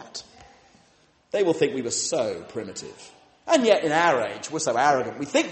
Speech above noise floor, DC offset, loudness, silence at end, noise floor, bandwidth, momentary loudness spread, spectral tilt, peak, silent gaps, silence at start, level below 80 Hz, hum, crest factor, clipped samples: 37 dB; under 0.1%; -23 LUFS; 0 s; -60 dBFS; 8.8 kHz; 18 LU; -3 dB/octave; -6 dBFS; none; 0 s; -66 dBFS; none; 20 dB; under 0.1%